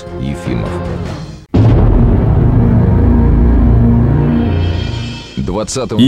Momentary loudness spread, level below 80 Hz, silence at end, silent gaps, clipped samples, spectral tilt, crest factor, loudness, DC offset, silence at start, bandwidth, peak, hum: 11 LU; -16 dBFS; 0 s; none; under 0.1%; -7.5 dB/octave; 10 dB; -12 LUFS; under 0.1%; 0 s; 10 kHz; 0 dBFS; none